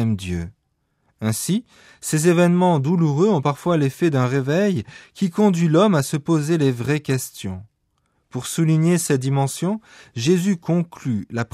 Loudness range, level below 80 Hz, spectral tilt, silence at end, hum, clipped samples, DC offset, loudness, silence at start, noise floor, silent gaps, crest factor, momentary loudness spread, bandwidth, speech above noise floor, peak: 3 LU; -54 dBFS; -6 dB/octave; 0.1 s; none; under 0.1%; under 0.1%; -20 LUFS; 0 s; -70 dBFS; none; 16 dB; 13 LU; 15 kHz; 50 dB; -4 dBFS